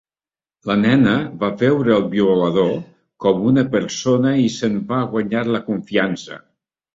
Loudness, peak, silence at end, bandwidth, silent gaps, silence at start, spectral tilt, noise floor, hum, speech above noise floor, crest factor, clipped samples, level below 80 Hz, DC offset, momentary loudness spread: -18 LUFS; -2 dBFS; 0.55 s; 7.8 kHz; none; 0.65 s; -6.5 dB/octave; under -90 dBFS; none; over 73 dB; 16 dB; under 0.1%; -54 dBFS; under 0.1%; 8 LU